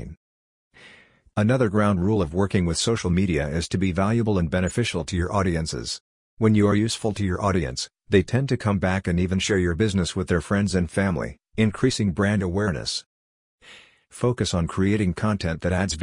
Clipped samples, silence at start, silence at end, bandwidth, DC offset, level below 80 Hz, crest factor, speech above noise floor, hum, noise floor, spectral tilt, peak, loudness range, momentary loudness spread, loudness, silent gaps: under 0.1%; 0 s; 0 s; 11 kHz; under 0.1%; -44 dBFS; 18 dB; 30 dB; none; -53 dBFS; -5.5 dB/octave; -6 dBFS; 3 LU; 6 LU; -23 LUFS; 0.17-0.71 s, 6.01-6.37 s, 13.06-13.59 s